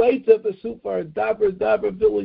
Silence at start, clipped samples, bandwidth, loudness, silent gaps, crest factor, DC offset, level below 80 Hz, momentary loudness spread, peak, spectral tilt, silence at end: 0 s; under 0.1%; 4.9 kHz; -21 LUFS; none; 18 dB; under 0.1%; -54 dBFS; 10 LU; -2 dBFS; -11 dB/octave; 0 s